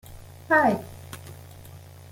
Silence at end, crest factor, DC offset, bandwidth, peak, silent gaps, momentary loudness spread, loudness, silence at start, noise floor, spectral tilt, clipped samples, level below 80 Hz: 0.35 s; 20 dB; under 0.1%; 17 kHz; -8 dBFS; none; 26 LU; -22 LUFS; 0.1 s; -45 dBFS; -6 dB/octave; under 0.1%; -56 dBFS